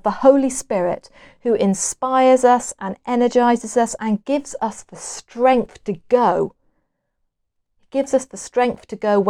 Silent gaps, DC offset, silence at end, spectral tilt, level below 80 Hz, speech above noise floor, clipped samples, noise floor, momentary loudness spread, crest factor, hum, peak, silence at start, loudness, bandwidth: none; under 0.1%; 0 s; -4.5 dB/octave; -54 dBFS; 54 dB; under 0.1%; -73 dBFS; 13 LU; 18 dB; none; 0 dBFS; 0.05 s; -19 LUFS; 12.5 kHz